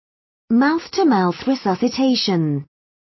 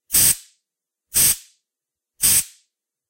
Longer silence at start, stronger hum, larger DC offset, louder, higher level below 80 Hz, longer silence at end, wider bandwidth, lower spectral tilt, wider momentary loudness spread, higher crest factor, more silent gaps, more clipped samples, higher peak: first, 0.5 s vs 0.1 s; neither; neither; second, -19 LUFS vs -16 LUFS; second, -60 dBFS vs -48 dBFS; second, 0.35 s vs 0.65 s; second, 6.2 kHz vs 16.5 kHz; first, -6 dB/octave vs 0.5 dB/octave; second, 4 LU vs 10 LU; second, 12 dB vs 22 dB; neither; neither; second, -6 dBFS vs 0 dBFS